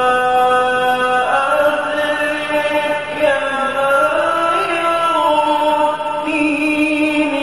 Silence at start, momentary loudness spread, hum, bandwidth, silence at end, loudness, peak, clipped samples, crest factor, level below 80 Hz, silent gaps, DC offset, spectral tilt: 0 s; 4 LU; none; 13 kHz; 0 s; -15 LUFS; -2 dBFS; under 0.1%; 12 dB; -52 dBFS; none; 0.5%; -3.5 dB/octave